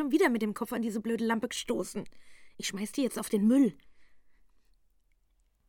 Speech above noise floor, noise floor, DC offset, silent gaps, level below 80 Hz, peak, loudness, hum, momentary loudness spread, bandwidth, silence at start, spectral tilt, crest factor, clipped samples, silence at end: 40 dB; -70 dBFS; under 0.1%; none; -66 dBFS; -12 dBFS; -30 LUFS; none; 11 LU; 18 kHz; 0 s; -4.5 dB/octave; 20 dB; under 0.1%; 1.5 s